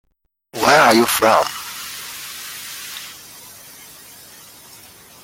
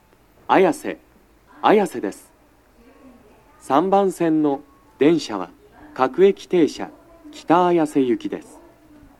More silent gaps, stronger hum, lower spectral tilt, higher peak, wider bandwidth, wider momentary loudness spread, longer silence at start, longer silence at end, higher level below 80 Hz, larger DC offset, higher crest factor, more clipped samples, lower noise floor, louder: neither; neither; second, -2.5 dB/octave vs -6 dB/octave; about the same, 0 dBFS vs 0 dBFS; first, 17 kHz vs 13 kHz; first, 26 LU vs 17 LU; about the same, 0.55 s vs 0.5 s; first, 2.1 s vs 0.8 s; about the same, -58 dBFS vs -60 dBFS; neither; about the same, 20 dB vs 20 dB; neither; about the same, -56 dBFS vs -54 dBFS; about the same, -17 LUFS vs -19 LUFS